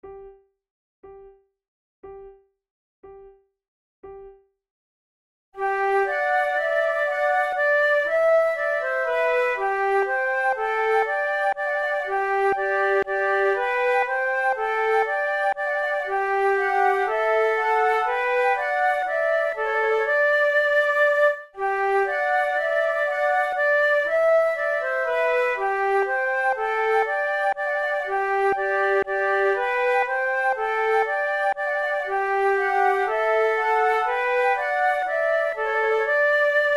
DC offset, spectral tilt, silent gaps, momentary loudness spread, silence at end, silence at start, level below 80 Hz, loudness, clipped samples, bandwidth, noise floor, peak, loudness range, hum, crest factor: under 0.1%; -3 dB/octave; 0.70-1.03 s, 1.68-2.03 s, 2.70-3.03 s, 3.68-4.03 s, 4.70-5.52 s; 4 LU; 0 s; 0.05 s; -60 dBFS; -22 LUFS; under 0.1%; 13.5 kHz; -50 dBFS; -8 dBFS; 2 LU; none; 14 dB